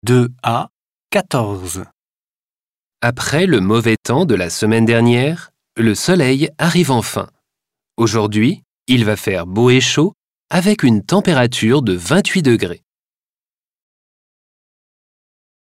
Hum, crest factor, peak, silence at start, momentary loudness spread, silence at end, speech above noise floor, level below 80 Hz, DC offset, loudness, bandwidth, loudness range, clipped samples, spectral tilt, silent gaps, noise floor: none; 16 dB; -2 dBFS; 0.05 s; 11 LU; 3 s; over 76 dB; -50 dBFS; under 0.1%; -15 LUFS; 16 kHz; 6 LU; under 0.1%; -5.5 dB/octave; 0.73-0.98 s, 1.93-2.91 s, 8.65-8.86 s, 10.14-10.40 s; under -90 dBFS